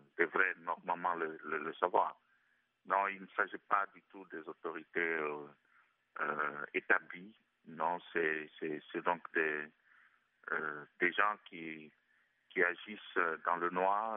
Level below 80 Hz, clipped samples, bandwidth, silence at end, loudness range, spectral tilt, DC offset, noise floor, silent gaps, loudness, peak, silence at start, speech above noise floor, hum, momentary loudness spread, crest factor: under -90 dBFS; under 0.1%; 3.9 kHz; 0 s; 3 LU; -2 dB/octave; under 0.1%; -76 dBFS; none; -36 LUFS; -14 dBFS; 0.2 s; 39 dB; none; 15 LU; 24 dB